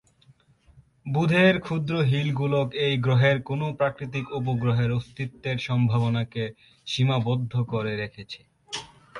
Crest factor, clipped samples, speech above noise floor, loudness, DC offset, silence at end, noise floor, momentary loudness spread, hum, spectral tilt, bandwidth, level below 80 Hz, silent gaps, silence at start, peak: 20 dB; under 0.1%; 34 dB; -25 LUFS; under 0.1%; 0 s; -59 dBFS; 15 LU; none; -7 dB/octave; 11 kHz; -56 dBFS; none; 1.05 s; -6 dBFS